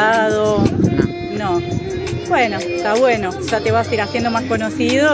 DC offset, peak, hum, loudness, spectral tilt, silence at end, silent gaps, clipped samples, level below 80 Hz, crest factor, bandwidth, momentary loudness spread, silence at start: under 0.1%; 0 dBFS; none; -17 LUFS; -5.5 dB/octave; 0 s; none; under 0.1%; -38 dBFS; 16 dB; 8 kHz; 6 LU; 0 s